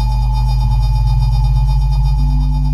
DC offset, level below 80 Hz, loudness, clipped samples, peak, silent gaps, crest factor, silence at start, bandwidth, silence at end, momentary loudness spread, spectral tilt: under 0.1%; -14 dBFS; -16 LUFS; under 0.1%; -4 dBFS; none; 10 dB; 0 s; 6.6 kHz; 0 s; 1 LU; -7.5 dB/octave